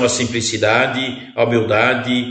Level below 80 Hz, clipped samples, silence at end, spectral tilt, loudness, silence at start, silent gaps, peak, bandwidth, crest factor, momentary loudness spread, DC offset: -54 dBFS; under 0.1%; 0 s; -4 dB/octave; -16 LUFS; 0 s; none; 0 dBFS; 9 kHz; 16 dB; 5 LU; under 0.1%